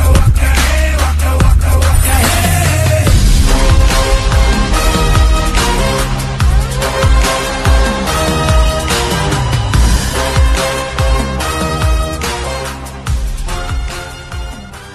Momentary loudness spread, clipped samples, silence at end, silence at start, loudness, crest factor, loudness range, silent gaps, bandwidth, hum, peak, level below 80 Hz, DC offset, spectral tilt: 9 LU; under 0.1%; 0 s; 0 s; -13 LUFS; 10 dB; 6 LU; none; 13.5 kHz; none; 0 dBFS; -14 dBFS; under 0.1%; -4.5 dB/octave